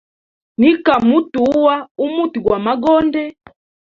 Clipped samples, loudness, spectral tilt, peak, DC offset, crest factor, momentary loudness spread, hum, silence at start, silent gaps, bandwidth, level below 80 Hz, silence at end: under 0.1%; -15 LUFS; -7 dB/octave; 0 dBFS; under 0.1%; 14 dB; 8 LU; none; 0.6 s; 1.91-1.95 s; 7 kHz; -50 dBFS; 0.65 s